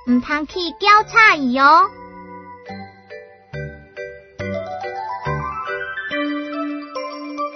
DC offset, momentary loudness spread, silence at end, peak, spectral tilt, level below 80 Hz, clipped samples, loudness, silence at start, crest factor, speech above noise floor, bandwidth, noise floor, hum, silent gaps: under 0.1%; 25 LU; 0 s; 0 dBFS; -4.5 dB/octave; -48 dBFS; under 0.1%; -17 LUFS; 0.05 s; 20 dB; 25 dB; 6.4 kHz; -40 dBFS; none; none